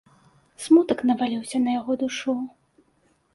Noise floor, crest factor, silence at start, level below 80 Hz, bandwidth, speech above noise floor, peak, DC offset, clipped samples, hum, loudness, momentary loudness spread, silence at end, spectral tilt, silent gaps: -65 dBFS; 18 dB; 0.6 s; -66 dBFS; 11.5 kHz; 43 dB; -6 dBFS; under 0.1%; under 0.1%; none; -23 LUFS; 11 LU; 0.85 s; -4.5 dB/octave; none